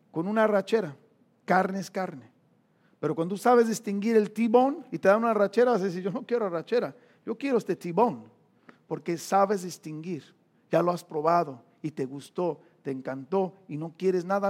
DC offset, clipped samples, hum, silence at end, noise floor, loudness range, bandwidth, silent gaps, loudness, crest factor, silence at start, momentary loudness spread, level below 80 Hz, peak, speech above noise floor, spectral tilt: under 0.1%; under 0.1%; none; 0 s; -65 dBFS; 6 LU; 16.5 kHz; none; -27 LUFS; 20 dB; 0.15 s; 15 LU; -86 dBFS; -8 dBFS; 39 dB; -6 dB/octave